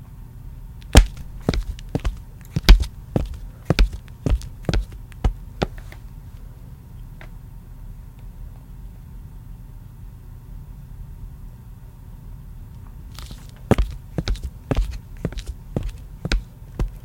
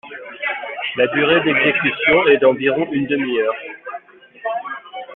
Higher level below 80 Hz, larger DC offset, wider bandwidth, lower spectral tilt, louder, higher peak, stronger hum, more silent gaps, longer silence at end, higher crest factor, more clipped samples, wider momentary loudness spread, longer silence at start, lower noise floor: first, -26 dBFS vs -58 dBFS; neither; first, 17 kHz vs 4.1 kHz; second, -5.5 dB/octave vs -9.5 dB/octave; second, -24 LUFS vs -17 LUFS; about the same, 0 dBFS vs -2 dBFS; neither; neither; about the same, 0.05 s vs 0 s; first, 24 dB vs 16 dB; neither; first, 20 LU vs 17 LU; about the same, 0 s vs 0.05 s; about the same, -40 dBFS vs -38 dBFS